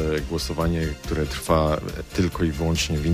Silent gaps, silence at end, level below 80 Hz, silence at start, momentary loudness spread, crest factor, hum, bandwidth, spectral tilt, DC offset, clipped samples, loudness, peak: none; 0 s; -32 dBFS; 0 s; 6 LU; 18 dB; none; 15.5 kHz; -5.5 dB/octave; under 0.1%; under 0.1%; -24 LUFS; -6 dBFS